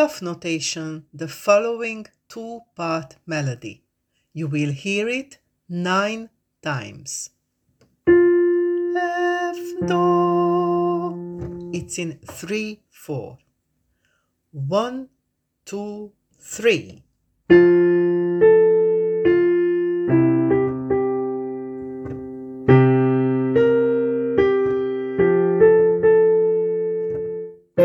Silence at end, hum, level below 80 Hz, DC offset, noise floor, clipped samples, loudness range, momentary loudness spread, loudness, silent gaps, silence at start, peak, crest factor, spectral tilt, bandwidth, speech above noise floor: 0 s; none; -54 dBFS; under 0.1%; -74 dBFS; under 0.1%; 12 LU; 18 LU; -19 LUFS; none; 0 s; 0 dBFS; 20 dB; -6.5 dB/octave; 13.5 kHz; 51 dB